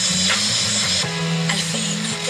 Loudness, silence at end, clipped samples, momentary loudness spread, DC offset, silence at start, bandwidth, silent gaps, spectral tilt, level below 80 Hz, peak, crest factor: -18 LUFS; 0 s; under 0.1%; 5 LU; under 0.1%; 0 s; 15.5 kHz; none; -2 dB/octave; -56 dBFS; -6 dBFS; 16 dB